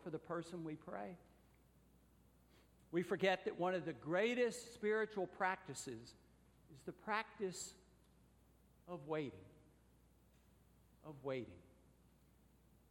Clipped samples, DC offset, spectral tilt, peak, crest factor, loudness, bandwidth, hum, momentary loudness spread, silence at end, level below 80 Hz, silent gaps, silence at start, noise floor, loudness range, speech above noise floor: under 0.1%; under 0.1%; -4.5 dB/octave; -24 dBFS; 22 dB; -43 LUFS; 17 kHz; none; 17 LU; 1.3 s; -74 dBFS; none; 0 s; -71 dBFS; 13 LU; 28 dB